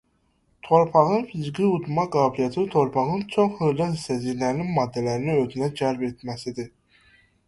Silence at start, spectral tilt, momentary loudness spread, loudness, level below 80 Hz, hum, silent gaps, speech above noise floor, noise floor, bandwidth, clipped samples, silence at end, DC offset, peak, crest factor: 0.65 s; -7 dB/octave; 11 LU; -24 LUFS; -58 dBFS; none; none; 44 dB; -66 dBFS; 11.5 kHz; under 0.1%; 0.8 s; under 0.1%; -4 dBFS; 20 dB